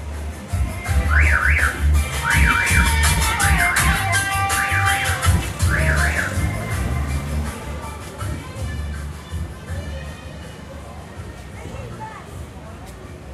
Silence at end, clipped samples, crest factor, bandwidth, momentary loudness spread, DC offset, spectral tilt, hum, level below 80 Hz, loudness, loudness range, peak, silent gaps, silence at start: 0 s; under 0.1%; 18 dB; 14 kHz; 20 LU; under 0.1%; -4 dB/octave; none; -26 dBFS; -19 LUFS; 16 LU; -4 dBFS; none; 0 s